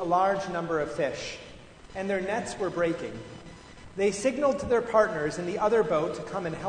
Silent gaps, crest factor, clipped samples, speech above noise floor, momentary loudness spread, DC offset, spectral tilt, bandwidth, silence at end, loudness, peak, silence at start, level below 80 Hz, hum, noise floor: none; 20 dB; under 0.1%; 20 dB; 18 LU; under 0.1%; -5 dB/octave; 9.6 kHz; 0 s; -28 LUFS; -8 dBFS; 0 s; -54 dBFS; none; -48 dBFS